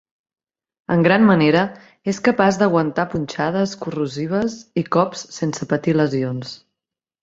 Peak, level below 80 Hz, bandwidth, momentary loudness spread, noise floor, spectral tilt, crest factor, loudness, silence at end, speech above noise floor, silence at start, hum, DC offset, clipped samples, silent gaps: 0 dBFS; -56 dBFS; 7.8 kHz; 12 LU; -86 dBFS; -6 dB/octave; 18 dB; -19 LUFS; 0.65 s; 67 dB; 0.9 s; none; under 0.1%; under 0.1%; none